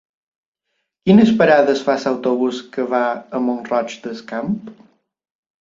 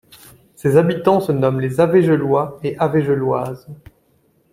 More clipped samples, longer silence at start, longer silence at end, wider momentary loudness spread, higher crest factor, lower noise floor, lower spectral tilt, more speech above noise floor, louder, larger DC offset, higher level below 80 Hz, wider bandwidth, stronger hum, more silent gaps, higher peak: neither; first, 1.05 s vs 0.65 s; about the same, 0.85 s vs 0.8 s; first, 14 LU vs 9 LU; about the same, 18 dB vs 16 dB; first, -74 dBFS vs -59 dBFS; second, -6.5 dB/octave vs -8 dB/octave; first, 57 dB vs 43 dB; about the same, -17 LUFS vs -17 LUFS; neither; about the same, -58 dBFS vs -54 dBFS; second, 7.6 kHz vs 16 kHz; neither; neither; about the same, 0 dBFS vs -2 dBFS